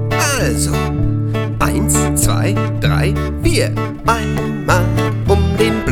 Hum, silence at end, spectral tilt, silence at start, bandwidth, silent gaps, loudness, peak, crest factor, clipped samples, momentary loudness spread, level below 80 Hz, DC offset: none; 0 s; -5 dB/octave; 0 s; 18 kHz; none; -16 LUFS; 0 dBFS; 14 dB; under 0.1%; 4 LU; -24 dBFS; under 0.1%